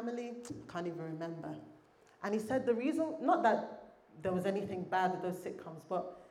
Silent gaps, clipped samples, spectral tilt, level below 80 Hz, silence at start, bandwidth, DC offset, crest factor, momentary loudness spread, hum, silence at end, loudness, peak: none; under 0.1%; -6.5 dB/octave; -76 dBFS; 0 s; 14.5 kHz; under 0.1%; 20 dB; 14 LU; none; 0.05 s; -36 LUFS; -16 dBFS